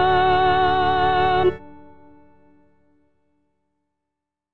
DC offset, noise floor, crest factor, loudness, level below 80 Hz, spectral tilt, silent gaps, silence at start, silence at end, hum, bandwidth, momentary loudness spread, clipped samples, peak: under 0.1%; -84 dBFS; 14 dB; -18 LUFS; -44 dBFS; -7.5 dB/octave; none; 0 s; 0.9 s; none; 5.6 kHz; 5 LU; under 0.1%; -8 dBFS